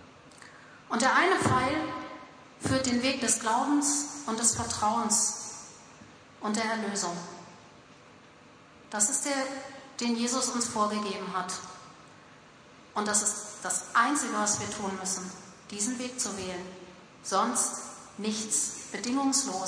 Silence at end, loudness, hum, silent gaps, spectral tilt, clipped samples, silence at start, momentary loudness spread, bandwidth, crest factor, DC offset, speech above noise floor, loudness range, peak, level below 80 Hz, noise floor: 0 s; -28 LUFS; none; none; -2.5 dB/octave; under 0.1%; 0 s; 16 LU; 11 kHz; 20 dB; under 0.1%; 25 dB; 5 LU; -10 dBFS; -64 dBFS; -54 dBFS